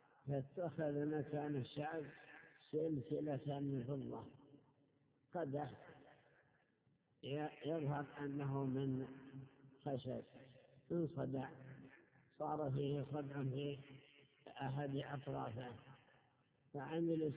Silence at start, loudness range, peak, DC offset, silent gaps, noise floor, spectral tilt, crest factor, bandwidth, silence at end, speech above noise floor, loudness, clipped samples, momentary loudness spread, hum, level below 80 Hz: 0.25 s; 5 LU; -30 dBFS; under 0.1%; none; -79 dBFS; -7 dB/octave; 16 dB; 4 kHz; 0 s; 35 dB; -45 LUFS; under 0.1%; 18 LU; none; -78 dBFS